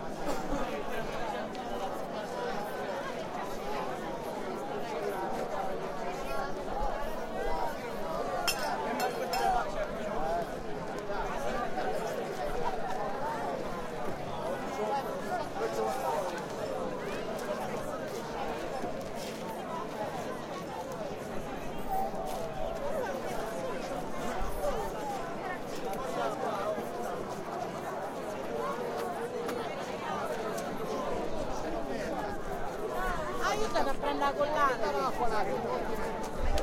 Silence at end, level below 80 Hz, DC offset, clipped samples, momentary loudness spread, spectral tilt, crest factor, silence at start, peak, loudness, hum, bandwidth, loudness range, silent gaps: 0 s; -46 dBFS; under 0.1%; under 0.1%; 6 LU; -4.5 dB/octave; 18 dB; 0 s; -14 dBFS; -35 LUFS; none; 16.5 kHz; 5 LU; none